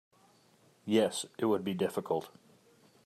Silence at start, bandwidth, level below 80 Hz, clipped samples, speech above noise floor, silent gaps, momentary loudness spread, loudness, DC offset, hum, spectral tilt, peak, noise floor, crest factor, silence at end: 0.85 s; 14.5 kHz; -82 dBFS; under 0.1%; 34 dB; none; 10 LU; -32 LUFS; under 0.1%; none; -5 dB/octave; -16 dBFS; -65 dBFS; 20 dB; 0.75 s